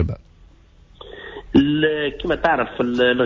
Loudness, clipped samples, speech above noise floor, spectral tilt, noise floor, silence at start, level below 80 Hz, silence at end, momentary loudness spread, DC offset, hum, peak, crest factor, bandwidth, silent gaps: -19 LUFS; under 0.1%; 31 dB; -7.5 dB/octave; -49 dBFS; 0 s; -38 dBFS; 0 s; 19 LU; under 0.1%; none; -4 dBFS; 16 dB; 7.4 kHz; none